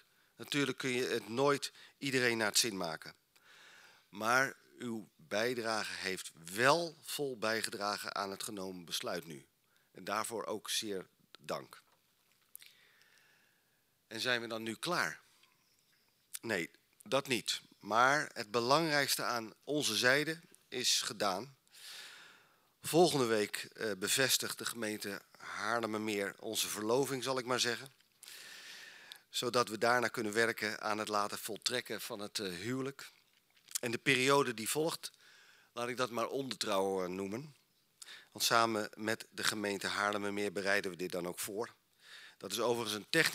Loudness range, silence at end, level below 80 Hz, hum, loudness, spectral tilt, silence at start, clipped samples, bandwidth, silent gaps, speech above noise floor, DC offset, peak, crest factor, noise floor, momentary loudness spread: 7 LU; 0 s; -86 dBFS; none; -35 LUFS; -2.5 dB/octave; 0.4 s; under 0.1%; 16 kHz; none; 40 dB; under 0.1%; -10 dBFS; 26 dB; -75 dBFS; 19 LU